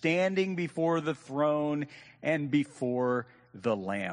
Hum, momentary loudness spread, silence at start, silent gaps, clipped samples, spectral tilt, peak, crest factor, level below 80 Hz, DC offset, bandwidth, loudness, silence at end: none; 8 LU; 0 s; none; under 0.1%; -6.5 dB/octave; -14 dBFS; 16 dB; -74 dBFS; under 0.1%; 10 kHz; -30 LUFS; 0 s